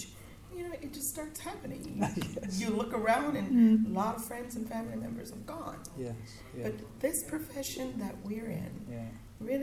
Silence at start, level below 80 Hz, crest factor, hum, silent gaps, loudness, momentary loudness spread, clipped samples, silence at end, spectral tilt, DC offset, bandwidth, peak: 0 s; -56 dBFS; 18 dB; none; none; -34 LUFS; 14 LU; under 0.1%; 0 s; -5 dB/octave; under 0.1%; 16 kHz; -16 dBFS